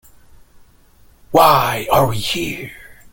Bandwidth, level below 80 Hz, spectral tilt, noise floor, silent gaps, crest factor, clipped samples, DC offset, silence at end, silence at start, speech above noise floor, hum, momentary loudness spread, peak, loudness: 17 kHz; -44 dBFS; -4.5 dB/octave; -49 dBFS; none; 18 dB; under 0.1%; under 0.1%; 0.2 s; 1.3 s; 34 dB; none; 15 LU; 0 dBFS; -15 LUFS